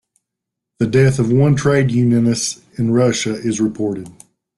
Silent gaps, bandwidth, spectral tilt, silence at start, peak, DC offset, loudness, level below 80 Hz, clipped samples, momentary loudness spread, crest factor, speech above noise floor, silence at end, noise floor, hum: none; 12 kHz; -6 dB/octave; 0.8 s; -2 dBFS; under 0.1%; -16 LUFS; -50 dBFS; under 0.1%; 9 LU; 14 dB; 66 dB; 0.45 s; -81 dBFS; none